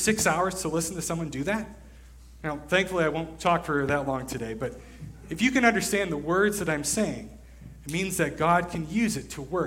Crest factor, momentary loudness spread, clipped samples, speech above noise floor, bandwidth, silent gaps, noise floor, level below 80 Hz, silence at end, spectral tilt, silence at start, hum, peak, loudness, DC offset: 22 dB; 13 LU; under 0.1%; 21 dB; 16.5 kHz; none; -48 dBFS; -48 dBFS; 0 s; -4 dB/octave; 0 s; none; -6 dBFS; -27 LUFS; under 0.1%